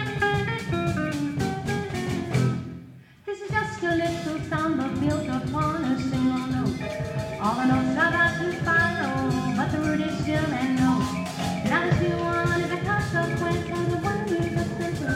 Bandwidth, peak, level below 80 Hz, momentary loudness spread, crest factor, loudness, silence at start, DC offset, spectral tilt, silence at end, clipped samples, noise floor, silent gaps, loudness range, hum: 15.5 kHz; -10 dBFS; -48 dBFS; 7 LU; 16 dB; -25 LUFS; 0 s; under 0.1%; -6 dB/octave; 0 s; under 0.1%; -46 dBFS; none; 4 LU; none